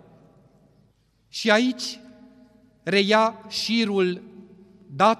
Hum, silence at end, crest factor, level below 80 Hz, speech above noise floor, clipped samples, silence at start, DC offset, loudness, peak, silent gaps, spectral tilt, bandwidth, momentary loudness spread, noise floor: none; 0.05 s; 22 dB; -70 dBFS; 41 dB; under 0.1%; 1.35 s; under 0.1%; -22 LUFS; -4 dBFS; none; -4 dB/octave; 14 kHz; 17 LU; -63 dBFS